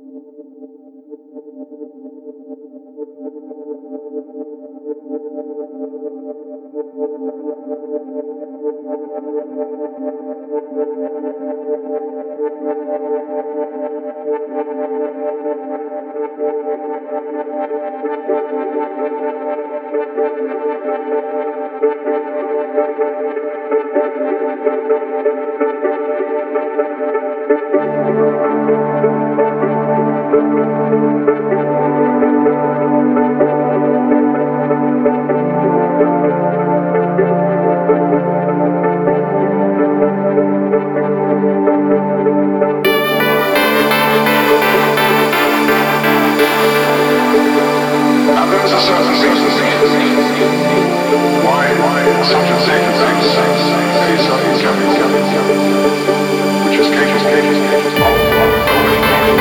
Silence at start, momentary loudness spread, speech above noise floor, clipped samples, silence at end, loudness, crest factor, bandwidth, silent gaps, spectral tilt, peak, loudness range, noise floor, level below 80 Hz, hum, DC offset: 0.05 s; 15 LU; 23 dB; under 0.1%; 0 s; -14 LUFS; 14 dB; 20 kHz; none; -5.5 dB/octave; 0 dBFS; 14 LU; -38 dBFS; -46 dBFS; none; under 0.1%